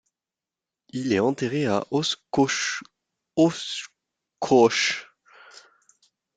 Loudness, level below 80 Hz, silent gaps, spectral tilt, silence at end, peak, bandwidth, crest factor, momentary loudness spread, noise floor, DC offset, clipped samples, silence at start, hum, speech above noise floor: -24 LUFS; -66 dBFS; none; -4 dB/octave; 0.8 s; -6 dBFS; 9.4 kHz; 20 dB; 15 LU; -90 dBFS; under 0.1%; under 0.1%; 0.95 s; none; 67 dB